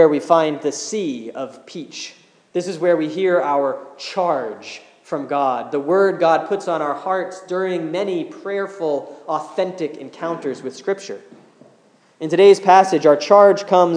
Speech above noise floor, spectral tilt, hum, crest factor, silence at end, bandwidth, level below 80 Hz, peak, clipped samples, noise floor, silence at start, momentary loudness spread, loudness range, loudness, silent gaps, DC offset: 36 dB; -5 dB/octave; none; 18 dB; 0 s; 10.5 kHz; -82 dBFS; 0 dBFS; under 0.1%; -54 dBFS; 0 s; 18 LU; 9 LU; -18 LUFS; none; under 0.1%